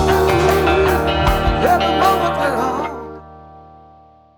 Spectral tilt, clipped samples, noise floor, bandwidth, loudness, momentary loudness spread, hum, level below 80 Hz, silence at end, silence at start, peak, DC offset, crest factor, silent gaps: -5.5 dB/octave; under 0.1%; -47 dBFS; over 20 kHz; -16 LUFS; 12 LU; none; -28 dBFS; 0.75 s; 0 s; 0 dBFS; under 0.1%; 16 dB; none